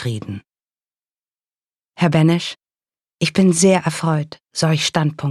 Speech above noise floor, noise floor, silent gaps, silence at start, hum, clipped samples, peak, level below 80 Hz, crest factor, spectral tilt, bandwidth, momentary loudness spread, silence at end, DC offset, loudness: over 73 dB; under -90 dBFS; 0.73-0.87 s, 1.19-1.25 s, 1.76-1.80 s; 0 s; none; under 0.1%; -4 dBFS; -56 dBFS; 16 dB; -5 dB/octave; 13 kHz; 14 LU; 0 s; under 0.1%; -17 LUFS